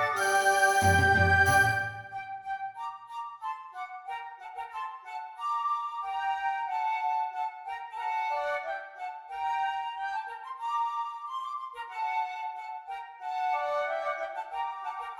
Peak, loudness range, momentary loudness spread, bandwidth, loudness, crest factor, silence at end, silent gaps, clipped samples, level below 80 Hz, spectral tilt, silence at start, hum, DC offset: -12 dBFS; 10 LU; 17 LU; 18 kHz; -30 LUFS; 18 dB; 0 s; none; under 0.1%; -58 dBFS; -3.5 dB/octave; 0 s; none; under 0.1%